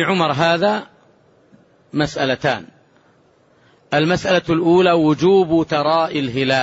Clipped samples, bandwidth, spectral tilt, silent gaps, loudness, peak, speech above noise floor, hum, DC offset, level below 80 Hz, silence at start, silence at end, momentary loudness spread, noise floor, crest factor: under 0.1%; 8 kHz; -6 dB/octave; none; -17 LUFS; -4 dBFS; 39 dB; none; under 0.1%; -52 dBFS; 0 s; 0 s; 8 LU; -55 dBFS; 14 dB